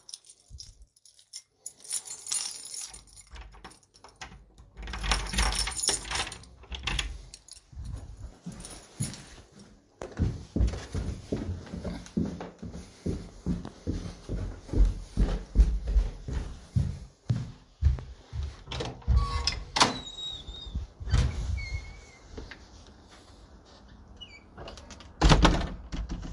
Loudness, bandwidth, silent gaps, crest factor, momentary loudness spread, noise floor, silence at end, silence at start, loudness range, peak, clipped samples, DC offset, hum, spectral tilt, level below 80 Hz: -31 LUFS; 11.5 kHz; none; 28 dB; 20 LU; -59 dBFS; 0 s; 0.1 s; 8 LU; -4 dBFS; under 0.1%; under 0.1%; none; -4 dB/octave; -34 dBFS